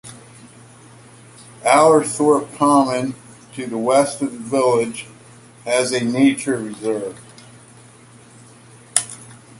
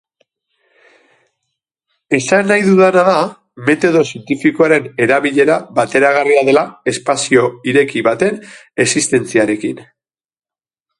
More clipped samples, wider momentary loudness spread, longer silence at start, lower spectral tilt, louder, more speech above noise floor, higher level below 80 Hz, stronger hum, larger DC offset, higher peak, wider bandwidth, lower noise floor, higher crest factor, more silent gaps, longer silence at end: neither; first, 20 LU vs 8 LU; second, 0.05 s vs 2.1 s; about the same, -4 dB/octave vs -4.5 dB/octave; second, -18 LUFS vs -13 LUFS; second, 28 dB vs over 77 dB; about the same, -62 dBFS vs -58 dBFS; neither; neither; about the same, 0 dBFS vs 0 dBFS; first, 16 kHz vs 11.5 kHz; second, -45 dBFS vs under -90 dBFS; first, 20 dB vs 14 dB; neither; second, 0.25 s vs 1.15 s